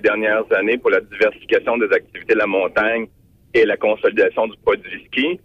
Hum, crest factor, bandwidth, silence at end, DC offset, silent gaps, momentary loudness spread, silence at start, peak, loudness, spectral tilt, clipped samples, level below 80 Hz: none; 12 dB; 6.6 kHz; 0.1 s; under 0.1%; none; 4 LU; 0.05 s; -6 dBFS; -18 LUFS; -6 dB/octave; under 0.1%; -54 dBFS